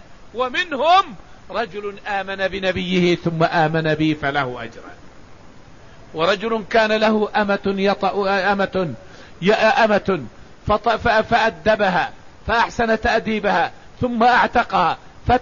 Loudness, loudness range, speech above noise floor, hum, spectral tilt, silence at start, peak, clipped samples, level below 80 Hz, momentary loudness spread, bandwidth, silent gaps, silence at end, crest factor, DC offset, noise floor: -19 LUFS; 3 LU; 25 dB; none; -5.5 dB/octave; 0.35 s; -4 dBFS; under 0.1%; -42 dBFS; 12 LU; 7.4 kHz; none; 0 s; 16 dB; 0.6%; -44 dBFS